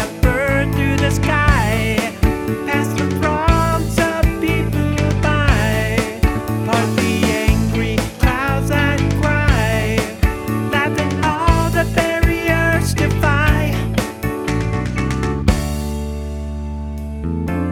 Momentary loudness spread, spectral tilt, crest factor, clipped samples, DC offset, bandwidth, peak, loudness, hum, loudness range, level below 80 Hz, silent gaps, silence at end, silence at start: 7 LU; -6 dB/octave; 16 dB; under 0.1%; under 0.1%; 18 kHz; 0 dBFS; -17 LUFS; none; 3 LU; -24 dBFS; none; 0 s; 0 s